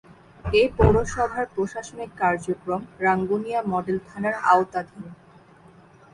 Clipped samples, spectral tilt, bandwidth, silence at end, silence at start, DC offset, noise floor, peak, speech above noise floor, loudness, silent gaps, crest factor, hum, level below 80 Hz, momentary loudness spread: under 0.1%; -6 dB/octave; 11.5 kHz; 1 s; 0.45 s; under 0.1%; -51 dBFS; -2 dBFS; 28 dB; -23 LUFS; none; 22 dB; none; -38 dBFS; 15 LU